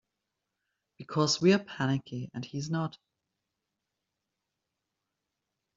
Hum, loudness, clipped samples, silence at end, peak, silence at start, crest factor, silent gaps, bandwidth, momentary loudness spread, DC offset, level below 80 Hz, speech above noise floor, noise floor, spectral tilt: none; -30 LUFS; under 0.1%; 2.85 s; -12 dBFS; 1 s; 22 dB; none; 7.6 kHz; 14 LU; under 0.1%; -72 dBFS; 56 dB; -86 dBFS; -5 dB/octave